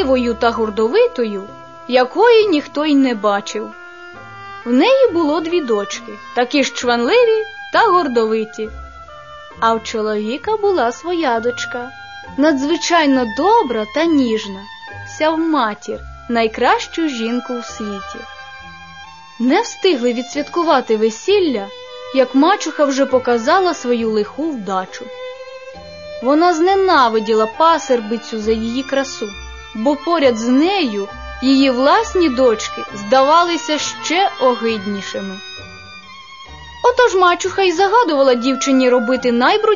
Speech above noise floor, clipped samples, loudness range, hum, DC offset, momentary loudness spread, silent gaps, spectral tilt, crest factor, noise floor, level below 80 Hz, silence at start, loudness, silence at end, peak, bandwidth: 22 dB; under 0.1%; 4 LU; none; 0.4%; 19 LU; none; -3.5 dB/octave; 16 dB; -37 dBFS; -46 dBFS; 0 s; -16 LUFS; 0 s; 0 dBFS; 7.4 kHz